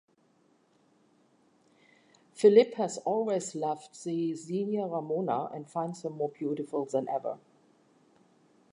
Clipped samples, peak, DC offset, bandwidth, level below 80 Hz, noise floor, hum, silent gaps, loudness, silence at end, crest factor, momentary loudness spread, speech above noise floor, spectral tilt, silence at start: under 0.1%; -8 dBFS; under 0.1%; 11 kHz; -88 dBFS; -67 dBFS; none; none; -30 LUFS; 1.35 s; 24 dB; 13 LU; 38 dB; -6 dB/octave; 2.35 s